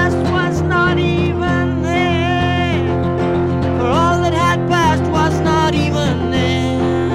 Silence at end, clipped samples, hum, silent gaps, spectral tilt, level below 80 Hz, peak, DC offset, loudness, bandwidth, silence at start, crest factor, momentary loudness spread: 0 s; under 0.1%; none; none; -6.5 dB/octave; -32 dBFS; -2 dBFS; under 0.1%; -15 LUFS; 13 kHz; 0 s; 12 dB; 3 LU